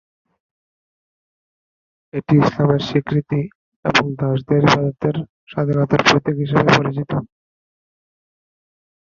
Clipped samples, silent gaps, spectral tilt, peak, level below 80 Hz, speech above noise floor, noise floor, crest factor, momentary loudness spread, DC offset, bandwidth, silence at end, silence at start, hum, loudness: under 0.1%; 3.55-3.83 s, 5.29-5.47 s; -6 dB/octave; 0 dBFS; -50 dBFS; over 73 dB; under -90 dBFS; 20 dB; 11 LU; under 0.1%; 7.4 kHz; 1.95 s; 2.15 s; none; -18 LUFS